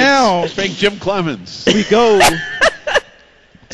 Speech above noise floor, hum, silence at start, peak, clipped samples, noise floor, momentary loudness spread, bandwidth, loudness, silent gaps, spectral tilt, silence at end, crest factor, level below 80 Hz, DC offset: 33 dB; none; 0 s; 0 dBFS; under 0.1%; -47 dBFS; 8 LU; 12 kHz; -14 LUFS; none; -3.5 dB/octave; 0 s; 14 dB; -40 dBFS; under 0.1%